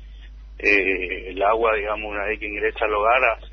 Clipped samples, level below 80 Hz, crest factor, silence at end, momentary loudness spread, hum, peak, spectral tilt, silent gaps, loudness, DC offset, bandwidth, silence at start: under 0.1%; -40 dBFS; 18 dB; 0 s; 8 LU; none; -4 dBFS; -5.5 dB/octave; none; -21 LUFS; under 0.1%; 6.6 kHz; 0 s